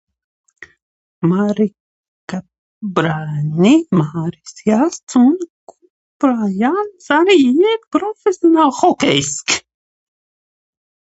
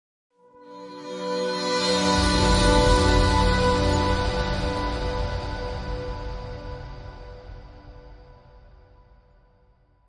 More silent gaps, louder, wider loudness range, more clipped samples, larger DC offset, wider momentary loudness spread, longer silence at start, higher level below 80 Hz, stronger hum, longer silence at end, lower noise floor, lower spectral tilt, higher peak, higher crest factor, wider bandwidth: first, 1.80-2.28 s, 2.58-2.81 s, 5.03-5.07 s, 5.50-5.67 s, 5.90-6.20 s vs none; first, -15 LUFS vs -23 LUFS; second, 4 LU vs 18 LU; neither; neither; second, 12 LU vs 22 LU; first, 1.2 s vs 0.6 s; second, -58 dBFS vs -30 dBFS; neither; about the same, 1.55 s vs 1.5 s; first, under -90 dBFS vs -60 dBFS; about the same, -5 dB/octave vs -5 dB/octave; first, 0 dBFS vs -6 dBFS; about the same, 16 dB vs 18 dB; second, 8.2 kHz vs 11 kHz